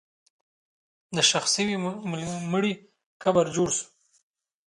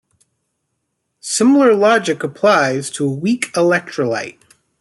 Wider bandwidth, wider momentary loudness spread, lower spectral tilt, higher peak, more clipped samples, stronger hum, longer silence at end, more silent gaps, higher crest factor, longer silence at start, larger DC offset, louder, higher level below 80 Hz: about the same, 11.5 kHz vs 12 kHz; about the same, 11 LU vs 10 LU; second, -3 dB/octave vs -4.5 dB/octave; second, -6 dBFS vs -2 dBFS; neither; neither; first, 0.8 s vs 0.5 s; first, 3.06-3.20 s vs none; first, 22 dB vs 14 dB; second, 1.1 s vs 1.25 s; neither; second, -25 LUFS vs -15 LUFS; about the same, -64 dBFS vs -66 dBFS